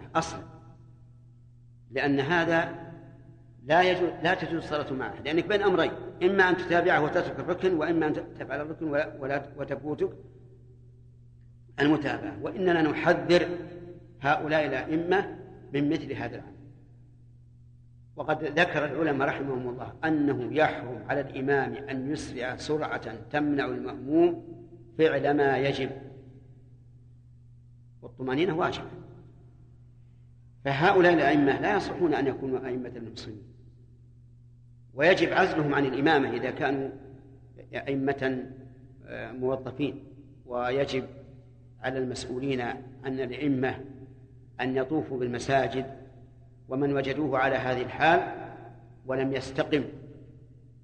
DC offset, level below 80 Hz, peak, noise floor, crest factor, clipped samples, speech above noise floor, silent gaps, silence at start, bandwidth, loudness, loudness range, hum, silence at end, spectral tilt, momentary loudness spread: under 0.1%; -56 dBFS; -8 dBFS; -53 dBFS; 20 dB; under 0.1%; 26 dB; none; 0 s; 9.6 kHz; -28 LUFS; 8 LU; none; 0.4 s; -6.5 dB/octave; 19 LU